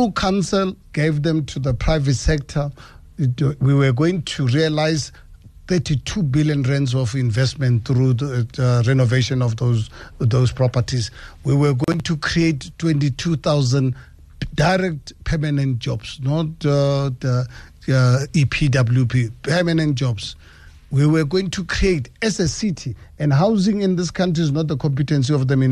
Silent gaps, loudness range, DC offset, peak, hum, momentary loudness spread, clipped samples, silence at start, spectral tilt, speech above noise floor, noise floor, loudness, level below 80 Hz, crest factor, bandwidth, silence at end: none; 2 LU; under 0.1%; -4 dBFS; none; 8 LU; under 0.1%; 0 s; -6.5 dB/octave; 25 dB; -44 dBFS; -19 LUFS; -36 dBFS; 14 dB; 10.5 kHz; 0 s